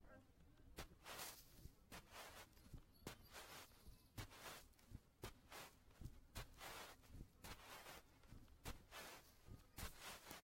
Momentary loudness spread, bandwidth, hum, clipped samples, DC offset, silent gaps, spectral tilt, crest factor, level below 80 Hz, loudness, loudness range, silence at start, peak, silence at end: 10 LU; 16.5 kHz; none; under 0.1%; under 0.1%; none; -3 dB/octave; 22 dB; -66 dBFS; -59 LUFS; 1 LU; 0 s; -38 dBFS; 0 s